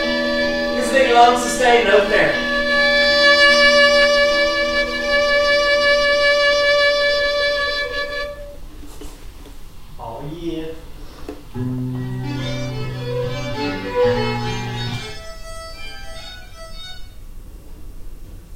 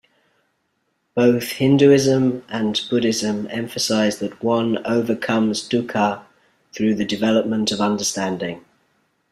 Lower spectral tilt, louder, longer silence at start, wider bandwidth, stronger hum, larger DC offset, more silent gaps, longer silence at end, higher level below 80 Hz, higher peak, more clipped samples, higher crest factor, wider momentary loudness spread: second, -3.5 dB/octave vs -5 dB/octave; first, -16 LUFS vs -19 LUFS; second, 0 s vs 1.15 s; about the same, 16 kHz vs 15 kHz; neither; first, 0.6% vs under 0.1%; neither; second, 0 s vs 0.7 s; first, -36 dBFS vs -60 dBFS; about the same, 0 dBFS vs -2 dBFS; neither; about the same, 18 dB vs 18 dB; first, 22 LU vs 10 LU